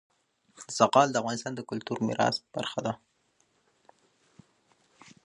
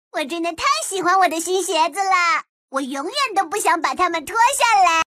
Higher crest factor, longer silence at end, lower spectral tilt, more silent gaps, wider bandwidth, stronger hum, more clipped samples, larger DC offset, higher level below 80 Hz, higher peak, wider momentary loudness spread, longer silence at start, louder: first, 26 dB vs 16 dB; first, 2.3 s vs 0.1 s; first, -4.5 dB/octave vs -0.5 dB/octave; second, none vs 2.49-2.68 s; second, 11.5 kHz vs 15 kHz; neither; neither; neither; second, -72 dBFS vs -58 dBFS; about the same, -6 dBFS vs -4 dBFS; first, 14 LU vs 10 LU; first, 0.6 s vs 0.15 s; second, -28 LUFS vs -19 LUFS